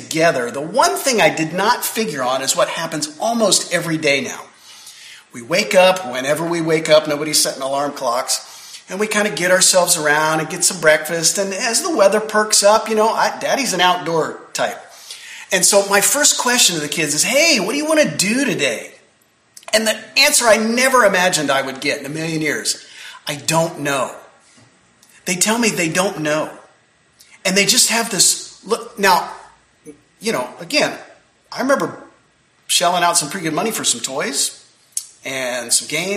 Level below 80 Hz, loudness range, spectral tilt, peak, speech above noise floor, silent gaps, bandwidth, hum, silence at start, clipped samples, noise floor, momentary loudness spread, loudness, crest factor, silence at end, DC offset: -62 dBFS; 6 LU; -2 dB/octave; 0 dBFS; 40 dB; none; 15.5 kHz; none; 0 s; under 0.1%; -57 dBFS; 12 LU; -16 LUFS; 18 dB; 0 s; under 0.1%